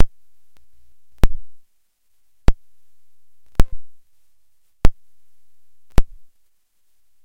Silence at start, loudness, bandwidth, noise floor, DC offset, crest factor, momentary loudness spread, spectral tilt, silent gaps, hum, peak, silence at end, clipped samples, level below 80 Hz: 0 s; -26 LUFS; 7 kHz; -72 dBFS; under 0.1%; 18 dB; 19 LU; -6.5 dB/octave; none; none; 0 dBFS; 1.2 s; 0.5%; -26 dBFS